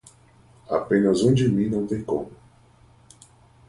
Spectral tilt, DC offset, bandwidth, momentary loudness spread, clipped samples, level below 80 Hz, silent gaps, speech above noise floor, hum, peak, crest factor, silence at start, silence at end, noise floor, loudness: -7 dB/octave; under 0.1%; 11.5 kHz; 10 LU; under 0.1%; -52 dBFS; none; 33 dB; none; -6 dBFS; 18 dB; 0.7 s; 1.35 s; -54 dBFS; -22 LUFS